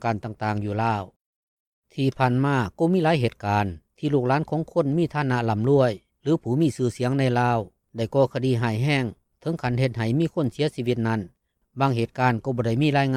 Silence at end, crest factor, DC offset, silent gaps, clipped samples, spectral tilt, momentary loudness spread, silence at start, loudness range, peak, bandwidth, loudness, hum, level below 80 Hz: 0 s; 16 dB; under 0.1%; 1.16-1.82 s; under 0.1%; -7.5 dB/octave; 9 LU; 0 s; 2 LU; -8 dBFS; 12.5 kHz; -24 LUFS; none; -56 dBFS